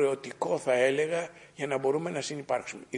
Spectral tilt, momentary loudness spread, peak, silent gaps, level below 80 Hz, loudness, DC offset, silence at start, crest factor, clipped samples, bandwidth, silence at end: -4.5 dB/octave; 9 LU; -12 dBFS; none; -74 dBFS; -30 LUFS; under 0.1%; 0 s; 18 dB; under 0.1%; 11 kHz; 0 s